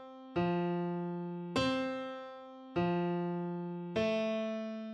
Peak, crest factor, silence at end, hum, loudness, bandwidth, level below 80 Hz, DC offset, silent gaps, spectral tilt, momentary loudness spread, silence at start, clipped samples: -20 dBFS; 16 dB; 0 s; none; -36 LUFS; 9.2 kHz; -66 dBFS; under 0.1%; none; -7 dB/octave; 8 LU; 0 s; under 0.1%